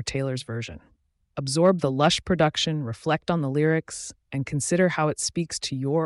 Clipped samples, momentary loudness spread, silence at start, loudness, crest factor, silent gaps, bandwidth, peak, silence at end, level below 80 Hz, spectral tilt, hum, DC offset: under 0.1%; 12 LU; 0 s; -25 LUFS; 16 dB; none; 11.5 kHz; -8 dBFS; 0 s; -54 dBFS; -5 dB/octave; none; under 0.1%